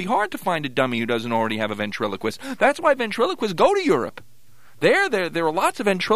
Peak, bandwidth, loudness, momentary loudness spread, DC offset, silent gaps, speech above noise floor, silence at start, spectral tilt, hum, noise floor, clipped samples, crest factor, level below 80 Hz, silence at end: -4 dBFS; 15.5 kHz; -21 LUFS; 7 LU; 0.9%; none; 35 dB; 0 s; -4.5 dB/octave; none; -56 dBFS; under 0.1%; 18 dB; -60 dBFS; 0 s